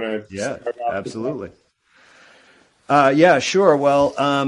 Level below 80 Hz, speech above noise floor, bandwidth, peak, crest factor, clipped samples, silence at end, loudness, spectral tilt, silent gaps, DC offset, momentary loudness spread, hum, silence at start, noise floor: -56 dBFS; 37 dB; 11 kHz; 0 dBFS; 18 dB; under 0.1%; 0 s; -18 LUFS; -5 dB/octave; none; under 0.1%; 14 LU; none; 0 s; -55 dBFS